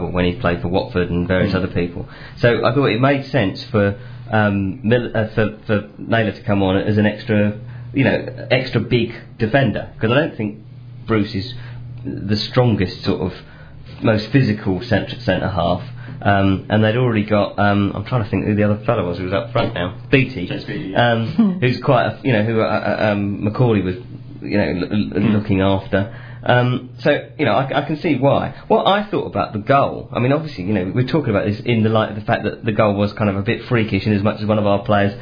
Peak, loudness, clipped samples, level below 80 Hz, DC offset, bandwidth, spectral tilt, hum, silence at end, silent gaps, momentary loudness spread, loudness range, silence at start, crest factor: 0 dBFS; -18 LUFS; under 0.1%; -42 dBFS; under 0.1%; 5.2 kHz; -9 dB/octave; none; 0 s; none; 8 LU; 2 LU; 0 s; 18 dB